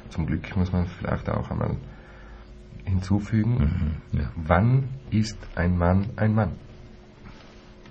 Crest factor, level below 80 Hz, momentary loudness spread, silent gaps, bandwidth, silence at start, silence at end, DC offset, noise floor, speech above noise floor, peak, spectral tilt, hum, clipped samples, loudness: 22 dB; -38 dBFS; 24 LU; none; 8.2 kHz; 0 s; 0 s; under 0.1%; -47 dBFS; 23 dB; -2 dBFS; -8 dB/octave; none; under 0.1%; -25 LUFS